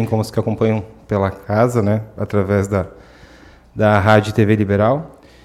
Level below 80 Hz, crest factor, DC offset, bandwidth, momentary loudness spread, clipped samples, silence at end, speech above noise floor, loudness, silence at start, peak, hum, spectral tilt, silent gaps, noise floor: -46 dBFS; 16 dB; under 0.1%; 13.5 kHz; 9 LU; under 0.1%; 0.35 s; 28 dB; -17 LUFS; 0 s; 0 dBFS; none; -7.5 dB/octave; none; -44 dBFS